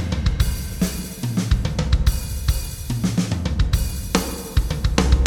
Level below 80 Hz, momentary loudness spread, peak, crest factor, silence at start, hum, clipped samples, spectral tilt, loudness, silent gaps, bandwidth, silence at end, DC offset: -22 dBFS; 4 LU; 0 dBFS; 20 dB; 0 s; none; under 0.1%; -5 dB/octave; -23 LUFS; none; 18.5 kHz; 0 s; under 0.1%